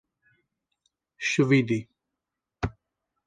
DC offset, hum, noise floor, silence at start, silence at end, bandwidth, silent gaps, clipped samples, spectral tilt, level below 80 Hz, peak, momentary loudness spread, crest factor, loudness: under 0.1%; none; -86 dBFS; 1.2 s; 0.55 s; 9.6 kHz; none; under 0.1%; -6 dB/octave; -50 dBFS; -10 dBFS; 13 LU; 20 dB; -26 LUFS